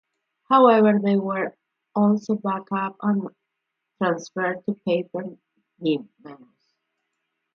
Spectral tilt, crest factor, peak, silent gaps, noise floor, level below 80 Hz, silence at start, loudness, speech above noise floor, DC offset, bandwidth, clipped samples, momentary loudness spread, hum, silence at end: -7.5 dB/octave; 20 dB; -4 dBFS; none; -81 dBFS; -74 dBFS; 0.5 s; -22 LUFS; 59 dB; under 0.1%; 6.8 kHz; under 0.1%; 14 LU; none; 1.2 s